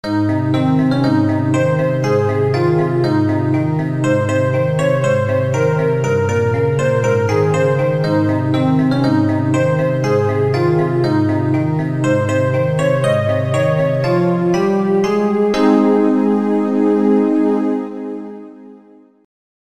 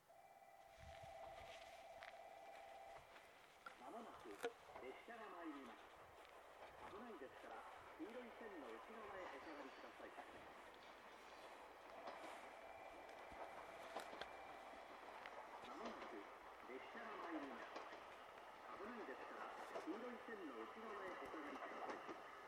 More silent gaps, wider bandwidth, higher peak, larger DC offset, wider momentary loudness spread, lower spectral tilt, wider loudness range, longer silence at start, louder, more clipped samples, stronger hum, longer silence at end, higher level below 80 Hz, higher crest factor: neither; second, 12 kHz vs 18 kHz; first, -2 dBFS vs -34 dBFS; first, 0.4% vs under 0.1%; second, 3 LU vs 9 LU; first, -7.5 dB/octave vs -4 dB/octave; second, 1 LU vs 5 LU; about the same, 0.05 s vs 0 s; first, -15 LUFS vs -56 LUFS; neither; neither; first, 0.95 s vs 0 s; first, -52 dBFS vs -82 dBFS; second, 14 dB vs 24 dB